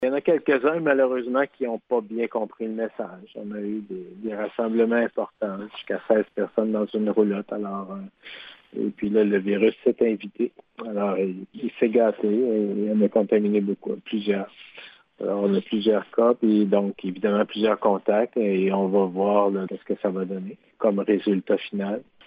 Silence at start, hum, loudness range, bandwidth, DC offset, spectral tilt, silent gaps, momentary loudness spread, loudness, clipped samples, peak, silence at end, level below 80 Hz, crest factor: 0 s; none; 5 LU; 5 kHz; under 0.1%; -10 dB/octave; none; 12 LU; -24 LUFS; under 0.1%; -6 dBFS; 0.25 s; -72 dBFS; 18 dB